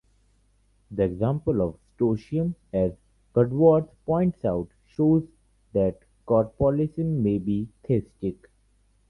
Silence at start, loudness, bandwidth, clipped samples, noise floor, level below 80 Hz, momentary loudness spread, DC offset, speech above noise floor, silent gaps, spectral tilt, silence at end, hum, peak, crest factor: 0.9 s; -25 LUFS; 5.8 kHz; under 0.1%; -64 dBFS; -48 dBFS; 9 LU; under 0.1%; 40 dB; none; -11 dB/octave; 0.75 s; none; -6 dBFS; 18 dB